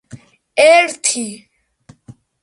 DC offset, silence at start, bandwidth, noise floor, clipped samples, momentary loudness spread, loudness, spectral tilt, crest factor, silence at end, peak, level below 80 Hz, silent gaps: under 0.1%; 0.15 s; 11.5 kHz; -48 dBFS; under 0.1%; 13 LU; -13 LUFS; -1.5 dB/octave; 18 dB; 1.1 s; 0 dBFS; -62 dBFS; none